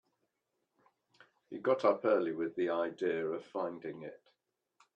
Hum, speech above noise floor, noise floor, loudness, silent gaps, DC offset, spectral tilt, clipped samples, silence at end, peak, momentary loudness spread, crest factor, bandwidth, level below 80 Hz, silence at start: none; 50 dB; -84 dBFS; -34 LUFS; none; under 0.1%; -7 dB/octave; under 0.1%; 0.8 s; -16 dBFS; 16 LU; 20 dB; 8.2 kHz; -84 dBFS; 1.5 s